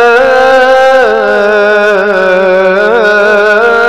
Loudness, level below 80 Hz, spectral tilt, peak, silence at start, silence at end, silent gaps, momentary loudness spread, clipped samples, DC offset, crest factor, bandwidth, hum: -6 LUFS; -42 dBFS; -4.5 dB/octave; 0 dBFS; 0 s; 0 s; none; 3 LU; 2%; under 0.1%; 6 dB; 12 kHz; none